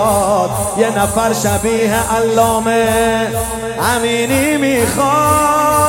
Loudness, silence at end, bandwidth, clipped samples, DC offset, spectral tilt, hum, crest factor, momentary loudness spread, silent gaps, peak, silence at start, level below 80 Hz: -14 LUFS; 0 s; 17 kHz; under 0.1%; under 0.1%; -4 dB/octave; none; 14 dB; 5 LU; none; 0 dBFS; 0 s; -34 dBFS